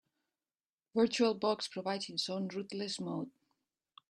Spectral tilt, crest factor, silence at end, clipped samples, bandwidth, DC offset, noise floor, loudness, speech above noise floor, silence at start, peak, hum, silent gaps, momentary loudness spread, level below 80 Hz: -4.5 dB/octave; 20 dB; 0.8 s; under 0.1%; 11.5 kHz; under 0.1%; under -90 dBFS; -35 LUFS; over 55 dB; 0.95 s; -18 dBFS; none; none; 10 LU; -80 dBFS